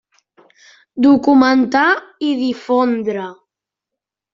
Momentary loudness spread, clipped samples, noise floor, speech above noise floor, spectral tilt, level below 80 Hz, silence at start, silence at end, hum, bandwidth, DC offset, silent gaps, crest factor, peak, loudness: 13 LU; under 0.1%; -83 dBFS; 69 dB; -5.5 dB/octave; -60 dBFS; 0.95 s; 1 s; none; 7.4 kHz; under 0.1%; none; 14 dB; -2 dBFS; -15 LUFS